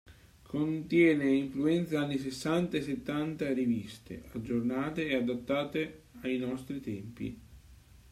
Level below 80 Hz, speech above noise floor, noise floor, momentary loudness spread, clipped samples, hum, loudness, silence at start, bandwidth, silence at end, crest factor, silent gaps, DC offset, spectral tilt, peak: -60 dBFS; 25 dB; -56 dBFS; 14 LU; under 0.1%; none; -32 LUFS; 0.05 s; 14 kHz; 0.35 s; 18 dB; none; under 0.1%; -6.5 dB/octave; -14 dBFS